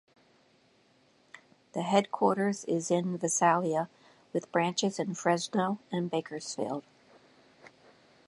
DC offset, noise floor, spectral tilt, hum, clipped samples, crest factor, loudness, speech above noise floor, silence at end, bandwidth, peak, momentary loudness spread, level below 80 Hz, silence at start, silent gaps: under 0.1%; -66 dBFS; -4.5 dB/octave; none; under 0.1%; 22 dB; -30 LUFS; 36 dB; 0.6 s; 11.5 kHz; -10 dBFS; 11 LU; -80 dBFS; 1.75 s; none